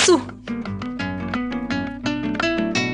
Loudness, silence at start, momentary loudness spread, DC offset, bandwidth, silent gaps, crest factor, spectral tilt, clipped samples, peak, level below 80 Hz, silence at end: -24 LUFS; 0 s; 8 LU; under 0.1%; 10.5 kHz; none; 18 dB; -4 dB/octave; under 0.1%; -4 dBFS; -46 dBFS; 0 s